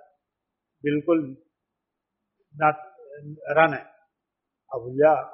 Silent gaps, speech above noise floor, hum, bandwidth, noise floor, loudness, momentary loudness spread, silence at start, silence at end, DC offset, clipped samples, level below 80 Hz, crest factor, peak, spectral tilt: none; 61 dB; none; 5.8 kHz; -84 dBFS; -23 LUFS; 19 LU; 0.85 s; 0 s; under 0.1%; under 0.1%; -72 dBFS; 24 dB; -4 dBFS; -5 dB/octave